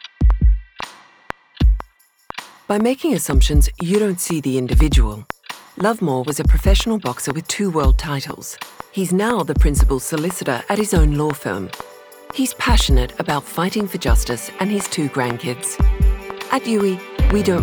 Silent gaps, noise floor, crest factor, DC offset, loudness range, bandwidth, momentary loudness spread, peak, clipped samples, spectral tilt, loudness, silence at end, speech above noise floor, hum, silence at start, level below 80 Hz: none; -40 dBFS; 16 dB; under 0.1%; 2 LU; over 20 kHz; 15 LU; -2 dBFS; under 0.1%; -5 dB/octave; -19 LUFS; 0 s; 23 dB; none; 0.2 s; -20 dBFS